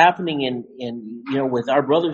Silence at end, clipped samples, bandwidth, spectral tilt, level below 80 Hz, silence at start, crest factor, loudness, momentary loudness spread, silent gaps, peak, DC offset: 0 s; under 0.1%; 7.4 kHz; -6 dB/octave; -64 dBFS; 0 s; 20 dB; -22 LUFS; 13 LU; none; 0 dBFS; under 0.1%